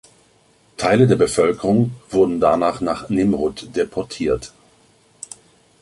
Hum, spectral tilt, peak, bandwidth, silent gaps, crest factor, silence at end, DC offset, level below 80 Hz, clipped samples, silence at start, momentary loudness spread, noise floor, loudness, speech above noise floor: none; -6.5 dB/octave; -2 dBFS; 11.5 kHz; none; 18 dB; 1.35 s; under 0.1%; -46 dBFS; under 0.1%; 0.8 s; 21 LU; -56 dBFS; -19 LUFS; 38 dB